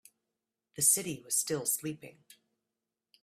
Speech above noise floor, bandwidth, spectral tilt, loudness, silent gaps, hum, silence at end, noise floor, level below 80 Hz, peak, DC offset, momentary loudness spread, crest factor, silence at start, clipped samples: 56 dB; 16 kHz; -2 dB/octave; -29 LUFS; none; none; 1.15 s; -89 dBFS; -74 dBFS; -12 dBFS; under 0.1%; 19 LU; 24 dB; 0.75 s; under 0.1%